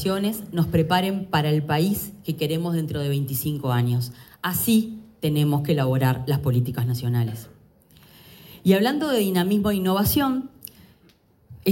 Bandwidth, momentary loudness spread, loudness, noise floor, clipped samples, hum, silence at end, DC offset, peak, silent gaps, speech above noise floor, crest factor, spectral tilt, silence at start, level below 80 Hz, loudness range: 17 kHz; 9 LU; -23 LUFS; -58 dBFS; under 0.1%; none; 0 s; under 0.1%; -4 dBFS; none; 36 dB; 18 dB; -6 dB/octave; 0 s; -50 dBFS; 2 LU